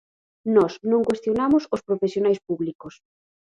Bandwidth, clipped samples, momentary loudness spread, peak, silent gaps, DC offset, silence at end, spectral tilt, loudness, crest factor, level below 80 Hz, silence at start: 10 kHz; under 0.1%; 9 LU; -6 dBFS; 2.75-2.79 s; under 0.1%; 0.7 s; -7 dB/octave; -22 LUFS; 18 dB; -60 dBFS; 0.45 s